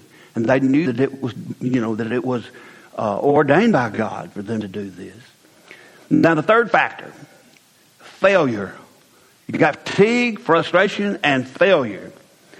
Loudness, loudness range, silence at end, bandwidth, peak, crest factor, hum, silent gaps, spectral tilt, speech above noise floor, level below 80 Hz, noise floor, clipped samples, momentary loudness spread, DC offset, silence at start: -18 LUFS; 3 LU; 0.5 s; 13 kHz; 0 dBFS; 20 dB; none; none; -6.5 dB/octave; 35 dB; -62 dBFS; -53 dBFS; under 0.1%; 16 LU; under 0.1%; 0.35 s